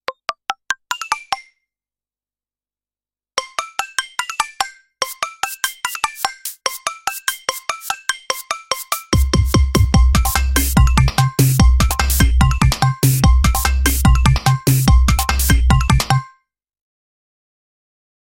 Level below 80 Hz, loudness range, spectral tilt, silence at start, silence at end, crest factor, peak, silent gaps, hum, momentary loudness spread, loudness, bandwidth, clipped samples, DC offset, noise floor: -20 dBFS; 12 LU; -4.5 dB/octave; 0.1 s; 1.95 s; 16 dB; 0 dBFS; none; 50 Hz at -40 dBFS; 10 LU; -17 LUFS; 17 kHz; under 0.1%; under 0.1%; under -90 dBFS